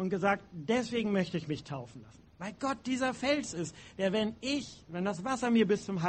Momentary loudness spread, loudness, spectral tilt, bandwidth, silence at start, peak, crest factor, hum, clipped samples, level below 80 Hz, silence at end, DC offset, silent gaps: 13 LU; -33 LUFS; -5 dB/octave; 8.8 kHz; 0 s; -14 dBFS; 18 dB; none; under 0.1%; -64 dBFS; 0 s; under 0.1%; none